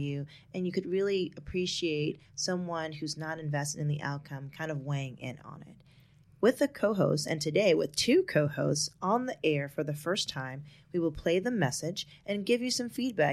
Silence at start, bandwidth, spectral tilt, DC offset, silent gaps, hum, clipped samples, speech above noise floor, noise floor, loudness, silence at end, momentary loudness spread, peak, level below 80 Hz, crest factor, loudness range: 0 s; 14.5 kHz; -4.5 dB/octave; under 0.1%; none; none; under 0.1%; 29 dB; -60 dBFS; -31 LUFS; 0 s; 12 LU; -12 dBFS; -62 dBFS; 20 dB; 7 LU